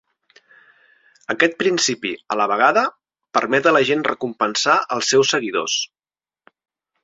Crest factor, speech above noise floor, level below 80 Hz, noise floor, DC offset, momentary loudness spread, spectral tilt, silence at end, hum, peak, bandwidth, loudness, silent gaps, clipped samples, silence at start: 18 dB; over 72 dB; -66 dBFS; under -90 dBFS; under 0.1%; 9 LU; -2.5 dB/octave; 1.2 s; none; -2 dBFS; 7.8 kHz; -18 LUFS; none; under 0.1%; 1.3 s